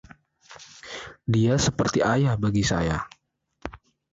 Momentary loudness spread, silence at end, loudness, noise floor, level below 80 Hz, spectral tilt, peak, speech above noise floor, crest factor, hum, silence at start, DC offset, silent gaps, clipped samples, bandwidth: 19 LU; 0.35 s; -23 LUFS; -68 dBFS; -44 dBFS; -5.5 dB/octave; -10 dBFS; 45 dB; 16 dB; none; 0.5 s; under 0.1%; none; under 0.1%; 8 kHz